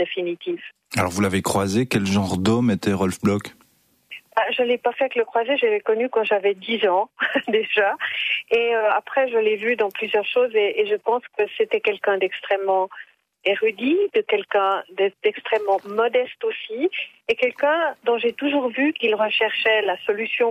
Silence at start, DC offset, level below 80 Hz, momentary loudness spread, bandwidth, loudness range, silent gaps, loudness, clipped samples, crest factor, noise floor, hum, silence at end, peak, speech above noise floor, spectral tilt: 0 s; under 0.1%; -62 dBFS; 6 LU; 15.5 kHz; 2 LU; none; -21 LUFS; under 0.1%; 14 dB; -61 dBFS; none; 0 s; -8 dBFS; 39 dB; -5 dB/octave